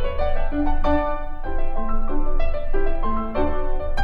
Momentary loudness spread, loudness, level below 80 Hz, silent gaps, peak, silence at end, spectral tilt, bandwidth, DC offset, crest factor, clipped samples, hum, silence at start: 7 LU; -26 LUFS; -20 dBFS; none; -6 dBFS; 0 s; -8.5 dB/octave; 3.8 kHz; under 0.1%; 12 dB; under 0.1%; none; 0 s